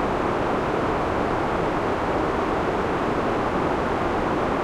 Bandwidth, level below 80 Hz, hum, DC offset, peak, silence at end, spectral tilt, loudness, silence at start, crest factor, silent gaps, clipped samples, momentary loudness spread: 14 kHz; -38 dBFS; none; under 0.1%; -10 dBFS; 0 s; -6.5 dB/octave; -24 LUFS; 0 s; 12 dB; none; under 0.1%; 0 LU